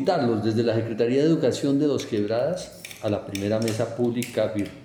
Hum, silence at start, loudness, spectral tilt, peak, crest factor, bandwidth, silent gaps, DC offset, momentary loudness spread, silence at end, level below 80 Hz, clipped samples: none; 0 s; -24 LUFS; -6.5 dB/octave; -10 dBFS; 14 dB; over 20 kHz; none; under 0.1%; 7 LU; 0 s; -60 dBFS; under 0.1%